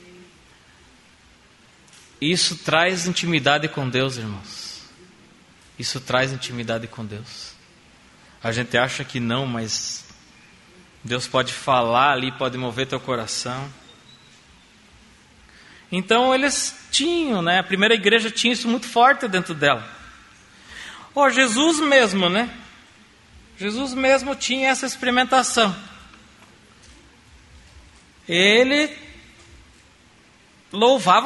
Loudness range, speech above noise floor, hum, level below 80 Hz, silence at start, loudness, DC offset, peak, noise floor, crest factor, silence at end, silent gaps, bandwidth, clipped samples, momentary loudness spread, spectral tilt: 8 LU; 32 dB; none; -56 dBFS; 2.2 s; -20 LUFS; under 0.1%; -2 dBFS; -53 dBFS; 22 dB; 0 s; none; 11.5 kHz; under 0.1%; 18 LU; -3.5 dB/octave